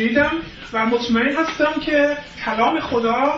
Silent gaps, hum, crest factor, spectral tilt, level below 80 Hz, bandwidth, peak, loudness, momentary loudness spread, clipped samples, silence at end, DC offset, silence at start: none; none; 14 dB; -5 dB/octave; -46 dBFS; 7.6 kHz; -4 dBFS; -19 LUFS; 7 LU; under 0.1%; 0 s; under 0.1%; 0 s